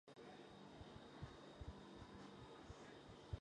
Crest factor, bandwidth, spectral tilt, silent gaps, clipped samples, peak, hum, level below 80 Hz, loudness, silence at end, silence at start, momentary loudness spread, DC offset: 22 dB; 10 kHz; -6 dB/octave; none; under 0.1%; -36 dBFS; none; -66 dBFS; -59 LUFS; 0 s; 0.05 s; 3 LU; under 0.1%